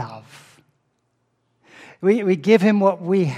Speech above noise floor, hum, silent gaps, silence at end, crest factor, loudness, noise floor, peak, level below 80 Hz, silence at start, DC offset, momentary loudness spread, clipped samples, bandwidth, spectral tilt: 52 dB; none; none; 0 s; 18 dB; -18 LUFS; -69 dBFS; -2 dBFS; -72 dBFS; 0 s; under 0.1%; 15 LU; under 0.1%; 11.5 kHz; -7.5 dB/octave